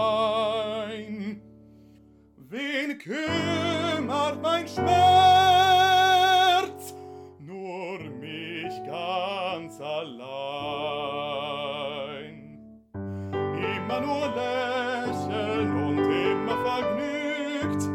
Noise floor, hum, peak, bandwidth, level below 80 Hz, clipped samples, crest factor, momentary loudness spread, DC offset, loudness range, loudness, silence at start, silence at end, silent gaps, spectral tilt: -55 dBFS; none; -8 dBFS; 17 kHz; -64 dBFS; under 0.1%; 18 dB; 18 LU; under 0.1%; 12 LU; -25 LUFS; 0 s; 0 s; none; -4.5 dB/octave